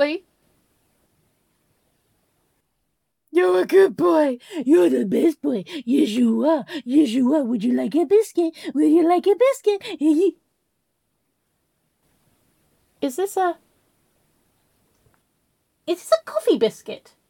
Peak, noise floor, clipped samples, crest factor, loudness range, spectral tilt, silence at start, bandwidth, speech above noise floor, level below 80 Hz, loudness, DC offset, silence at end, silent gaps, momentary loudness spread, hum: -4 dBFS; -75 dBFS; under 0.1%; 18 dB; 11 LU; -5.5 dB/octave; 0 s; 17 kHz; 56 dB; -74 dBFS; -20 LUFS; under 0.1%; 0.35 s; none; 11 LU; none